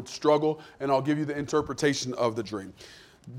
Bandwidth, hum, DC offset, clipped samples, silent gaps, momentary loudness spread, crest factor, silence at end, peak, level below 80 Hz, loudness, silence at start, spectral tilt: 15.5 kHz; none; under 0.1%; under 0.1%; none; 15 LU; 18 dB; 0 s; -10 dBFS; -60 dBFS; -27 LUFS; 0 s; -5 dB/octave